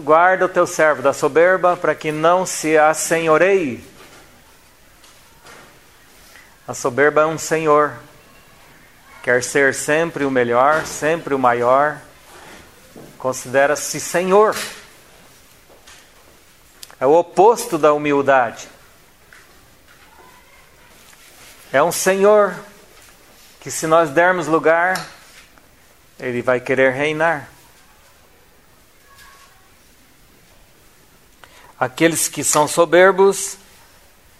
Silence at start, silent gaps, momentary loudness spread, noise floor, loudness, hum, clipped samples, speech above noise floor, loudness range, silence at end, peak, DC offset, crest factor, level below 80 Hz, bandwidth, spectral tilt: 0 s; none; 13 LU; -51 dBFS; -16 LUFS; none; under 0.1%; 36 dB; 6 LU; 0.85 s; 0 dBFS; 0.2%; 18 dB; -56 dBFS; 16 kHz; -3.5 dB/octave